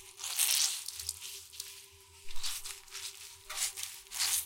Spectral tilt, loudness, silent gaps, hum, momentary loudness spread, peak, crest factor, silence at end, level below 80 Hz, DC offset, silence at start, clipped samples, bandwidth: 3 dB/octave; -34 LUFS; none; none; 20 LU; -10 dBFS; 26 dB; 0 s; -58 dBFS; under 0.1%; 0 s; under 0.1%; 17 kHz